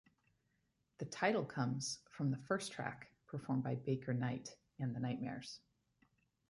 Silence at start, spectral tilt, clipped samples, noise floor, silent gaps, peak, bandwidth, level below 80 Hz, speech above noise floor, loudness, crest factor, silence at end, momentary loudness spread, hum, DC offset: 1 s; -5.5 dB/octave; under 0.1%; -82 dBFS; none; -22 dBFS; 11.5 kHz; -76 dBFS; 42 dB; -41 LUFS; 20 dB; 0.9 s; 13 LU; none; under 0.1%